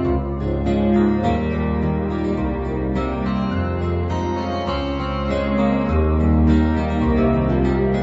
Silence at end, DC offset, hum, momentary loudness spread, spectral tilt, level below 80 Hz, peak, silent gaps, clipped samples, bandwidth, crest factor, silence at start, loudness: 0 s; under 0.1%; none; 6 LU; -9 dB/octave; -26 dBFS; -6 dBFS; none; under 0.1%; 7.8 kHz; 14 dB; 0 s; -20 LUFS